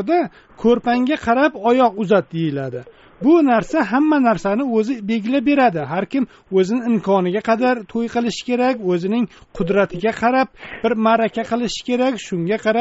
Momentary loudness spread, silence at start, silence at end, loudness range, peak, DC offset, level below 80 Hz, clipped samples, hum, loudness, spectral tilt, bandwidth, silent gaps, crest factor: 7 LU; 0 s; 0 s; 2 LU; -2 dBFS; under 0.1%; -50 dBFS; under 0.1%; none; -18 LUFS; -5 dB/octave; 8 kHz; none; 16 dB